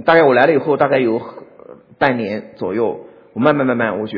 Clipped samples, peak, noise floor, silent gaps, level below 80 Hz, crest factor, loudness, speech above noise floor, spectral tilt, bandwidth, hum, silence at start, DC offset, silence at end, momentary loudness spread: under 0.1%; 0 dBFS; -41 dBFS; none; -60 dBFS; 16 dB; -16 LUFS; 26 dB; -9 dB/octave; 5.4 kHz; none; 0 s; under 0.1%; 0 s; 13 LU